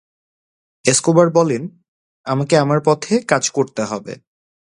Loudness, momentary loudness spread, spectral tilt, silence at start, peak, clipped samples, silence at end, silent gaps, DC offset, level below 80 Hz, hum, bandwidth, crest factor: -17 LUFS; 18 LU; -4.5 dB/octave; 0.85 s; 0 dBFS; under 0.1%; 0.55 s; 1.88-2.24 s; under 0.1%; -60 dBFS; none; 11.5 kHz; 18 dB